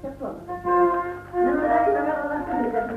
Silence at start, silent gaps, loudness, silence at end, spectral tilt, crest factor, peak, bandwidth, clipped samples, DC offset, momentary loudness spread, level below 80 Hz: 0 s; none; -23 LUFS; 0 s; -8 dB/octave; 14 dB; -8 dBFS; 5 kHz; under 0.1%; under 0.1%; 11 LU; -48 dBFS